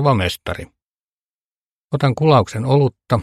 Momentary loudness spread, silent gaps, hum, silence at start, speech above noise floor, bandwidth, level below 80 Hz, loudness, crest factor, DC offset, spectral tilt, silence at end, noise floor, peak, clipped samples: 13 LU; 0.83-1.89 s; none; 0 s; over 73 dB; 13.5 kHz; -46 dBFS; -17 LUFS; 18 dB; under 0.1%; -7 dB/octave; 0 s; under -90 dBFS; 0 dBFS; under 0.1%